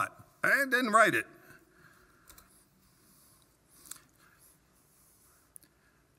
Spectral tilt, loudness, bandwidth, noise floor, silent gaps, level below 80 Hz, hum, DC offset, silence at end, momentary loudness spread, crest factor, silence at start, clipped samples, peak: -3 dB/octave; -27 LUFS; 16 kHz; -68 dBFS; none; -74 dBFS; none; under 0.1%; 4.95 s; 25 LU; 24 dB; 0 s; under 0.1%; -10 dBFS